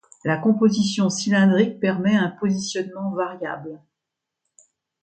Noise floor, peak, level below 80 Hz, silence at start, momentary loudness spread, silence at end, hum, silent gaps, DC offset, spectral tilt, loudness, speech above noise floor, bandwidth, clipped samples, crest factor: -84 dBFS; -4 dBFS; -66 dBFS; 0.25 s; 11 LU; 1.25 s; none; none; under 0.1%; -5.5 dB/octave; -21 LUFS; 63 dB; 9 kHz; under 0.1%; 18 dB